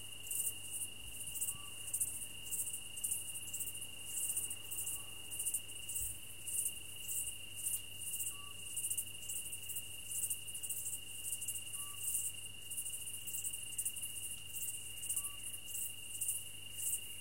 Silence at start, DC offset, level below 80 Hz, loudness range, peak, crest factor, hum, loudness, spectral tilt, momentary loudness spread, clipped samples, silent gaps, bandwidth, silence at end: 0 s; 0.3%; -66 dBFS; 1 LU; -22 dBFS; 20 dB; none; -40 LUFS; 0.5 dB/octave; 5 LU; under 0.1%; none; 17 kHz; 0 s